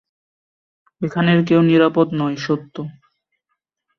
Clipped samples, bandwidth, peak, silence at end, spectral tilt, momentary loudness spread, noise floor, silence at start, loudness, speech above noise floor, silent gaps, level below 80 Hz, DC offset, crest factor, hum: under 0.1%; 6.6 kHz; -2 dBFS; 1.1 s; -7.5 dB/octave; 17 LU; -76 dBFS; 1 s; -17 LUFS; 59 dB; none; -60 dBFS; under 0.1%; 18 dB; none